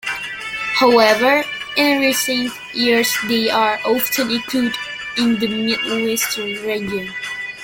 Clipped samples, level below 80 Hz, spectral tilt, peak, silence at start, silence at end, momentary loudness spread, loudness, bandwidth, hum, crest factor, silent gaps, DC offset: under 0.1%; -56 dBFS; -2.5 dB/octave; 0 dBFS; 0.05 s; 0 s; 11 LU; -17 LUFS; 17 kHz; none; 18 dB; none; under 0.1%